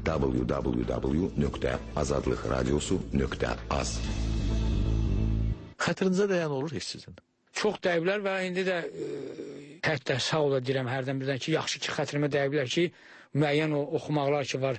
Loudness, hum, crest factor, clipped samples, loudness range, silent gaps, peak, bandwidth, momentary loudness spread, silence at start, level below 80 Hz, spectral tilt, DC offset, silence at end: -29 LUFS; none; 14 dB; under 0.1%; 2 LU; none; -14 dBFS; 8.8 kHz; 6 LU; 0 s; -38 dBFS; -5.5 dB/octave; under 0.1%; 0 s